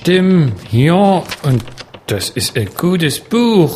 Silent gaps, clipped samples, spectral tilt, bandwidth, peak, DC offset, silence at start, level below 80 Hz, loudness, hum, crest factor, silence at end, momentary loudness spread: none; under 0.1%; -6 dB/octave; 15.5 kHz; 0 dBFS; under 0.1%; 0 s; -44 dBFS; -14 LUFS; none; 14 dB; 0 s; 9 LU